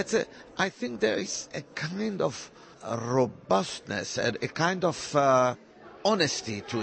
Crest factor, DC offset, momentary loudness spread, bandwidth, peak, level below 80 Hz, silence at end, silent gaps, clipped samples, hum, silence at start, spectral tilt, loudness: 20 dB; under 0.1%; 11 LU; 8.8 kHz; -10 dBFS; -66 dBFS; 0 s; none; under 0.1%; none; 0 s; -4 dB/octave; -28 LUFS